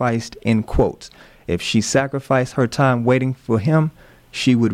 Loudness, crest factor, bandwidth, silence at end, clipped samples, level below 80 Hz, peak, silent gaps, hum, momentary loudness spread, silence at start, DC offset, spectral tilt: -19 LUFS; 14 dB; 14.5 kHz; 0 s; under 0.1%; -36 dBFS; -6 dBFS; none; none; 8 LU; 0 s; under 0.1%; -6 dB/octave